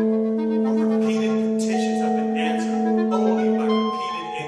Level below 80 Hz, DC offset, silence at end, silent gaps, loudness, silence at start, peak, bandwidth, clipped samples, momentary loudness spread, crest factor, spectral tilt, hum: -64 dBFS; under 0.1%; 0 s; none; -22 LUFS; 0 s; -8 dBFS; 10.5 kHz; under 0.1%; 2 LU; 14 dB; -6 dB/octave; none